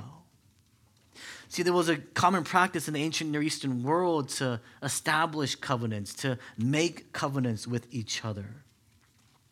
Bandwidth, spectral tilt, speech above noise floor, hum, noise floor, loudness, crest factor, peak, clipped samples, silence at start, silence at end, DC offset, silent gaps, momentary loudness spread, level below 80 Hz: 16.5 kHz; -4.5 dB/octave; 35 dB; none; -64 dBFS; -29 LUFS; 24 dB; -8 dBFS; under 0.1%; 0 s; 0.9 s; under 0.1%; none; 11 LU; -72 dBFS